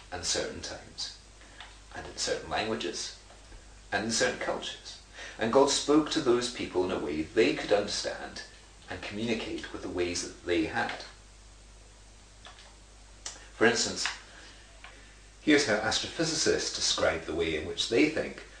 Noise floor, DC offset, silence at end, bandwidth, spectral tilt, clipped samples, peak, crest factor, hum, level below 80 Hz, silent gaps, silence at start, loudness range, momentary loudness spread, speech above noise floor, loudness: -53 dBFS; under 0.1%; 0 s; 10.5 kHz; -3 dB/octave; under 0.1%; -10 dBFS; 22 dB; none; -54 dBFS; none; 0 s; 8 LU; 22 LU; 24 dB; -29 LUFS